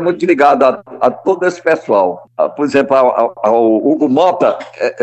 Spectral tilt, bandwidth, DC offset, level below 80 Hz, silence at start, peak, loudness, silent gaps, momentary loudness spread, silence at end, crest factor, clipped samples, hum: -6 dB/octave; 8.4 kHz; under 0.1%; -64 dBFS; 0 s; 0 dBFS; -13 LUFS; none; 7 LU; 0 s; 12 dB; under 0.1%; none